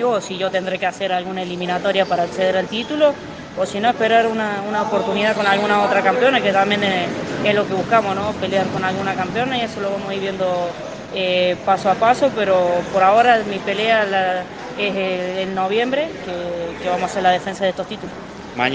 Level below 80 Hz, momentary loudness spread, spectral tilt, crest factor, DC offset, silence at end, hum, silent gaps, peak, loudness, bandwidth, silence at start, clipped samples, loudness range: -54 dBFS; 10 LU; -5 dB/octave; 18 dB; under 0.1%; 0 s; none; none; 0 dBFS; -19 LUFS; 9.6 kHz; 0 s; under 0.1%; 4 LU